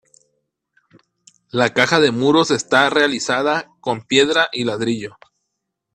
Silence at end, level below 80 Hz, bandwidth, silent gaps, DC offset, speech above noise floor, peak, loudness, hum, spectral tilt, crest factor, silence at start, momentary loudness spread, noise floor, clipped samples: 0.85 s; -60 dBFS; 12.5 kHz; none; under 0.1%; 60 dB; 0 dBFS; -17 LUFS; none; -3.5 dB/octave; 20 dB; 1.55 s; 11 LU; -77 dBFS; under 0.1%